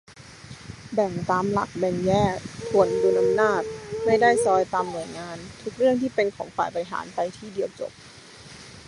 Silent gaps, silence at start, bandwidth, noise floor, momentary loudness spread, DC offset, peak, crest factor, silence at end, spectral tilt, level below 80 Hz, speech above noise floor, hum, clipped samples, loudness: none; 0.1 s; 11.5 kHz; -45 dBFS; 21 LU; under 0.1%; -4 dBFS; 20 dB; 0.05 s; -5.5 dB/octave; -54 dBFS; 21 dB; none; under 0.1%; -24 LUFS